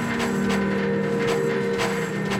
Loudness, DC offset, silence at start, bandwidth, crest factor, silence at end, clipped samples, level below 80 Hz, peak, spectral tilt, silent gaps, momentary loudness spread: -23 LUFS; under 0.1%; 0 s; 16 kHz; 12 dB; 0 s; under 0.1%; -50 dBFS; -10 dBFS; -5.5 dB/octave; none; 2 LU